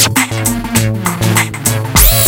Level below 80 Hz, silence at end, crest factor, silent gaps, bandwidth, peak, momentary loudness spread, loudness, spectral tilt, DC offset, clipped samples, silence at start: -20 dBFS; 0 s; 12 dB; none; over 20 kHz; 0 dBFS; 6 LU; -12 LUFS; -3 dB/octave; under 0.1%; 0.5%; 0 s